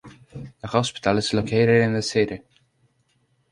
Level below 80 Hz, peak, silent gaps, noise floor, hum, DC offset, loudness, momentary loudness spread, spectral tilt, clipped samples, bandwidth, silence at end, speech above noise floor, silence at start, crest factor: -52 dBFS; -4 dBFS; none; -67 dBFS; none; under 0.1%; -21 LUFS; 21 LU; -5.5 dB/octave; under 0.1%; 11.5 kHz; 1.15 s; 45 dB; 0.05 s; 20 dB